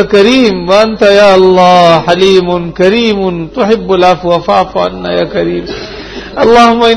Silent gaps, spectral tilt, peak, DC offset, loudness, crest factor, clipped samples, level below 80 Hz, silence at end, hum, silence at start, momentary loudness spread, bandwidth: none; -5.5 dB/octave; 0 dBFS; under 0.1%; -7 LUFS; 8 dB; 3%; -34 dBFS; 0 s; none; 0 s; 10 LU; 11 kHz